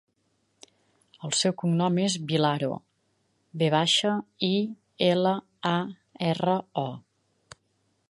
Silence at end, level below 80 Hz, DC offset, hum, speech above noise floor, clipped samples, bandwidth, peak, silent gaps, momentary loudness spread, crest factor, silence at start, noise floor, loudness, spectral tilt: 1.1 s; -74 dBFS; under 0.1%; none; 47 dB; under 0.1%; 11.5 kHz; -8 dBFS; none; 12 LU; 20 dB; 1.2 s; -72 dBFS; -26 LUFS; -4.5 dB/octave